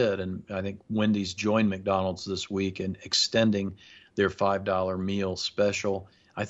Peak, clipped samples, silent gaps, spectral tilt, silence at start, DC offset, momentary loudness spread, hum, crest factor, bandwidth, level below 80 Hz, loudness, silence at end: -10 dBFS; under 0.1%; none; -4.5 dB/octave; 0 s; under 0.1%; 10 LU; none; 18 dB; 8.2 kHz; -62 dBFS; -28 LUFS; 0 s